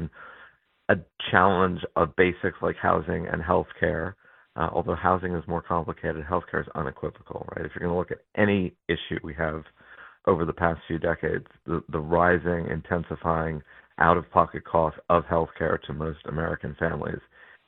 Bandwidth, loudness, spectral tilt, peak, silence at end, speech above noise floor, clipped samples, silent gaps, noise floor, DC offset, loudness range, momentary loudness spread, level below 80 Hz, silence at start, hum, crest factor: 4.1 kHz; -26 LUFS; -10.5 dB/octave; -2 dBFS; 0.5 s; 29 dB; under 0.1%; none; -55 dBFS; under 0.1%; 4 LU; 12 LU; -46 dBFS; 0 s; none; 24 dB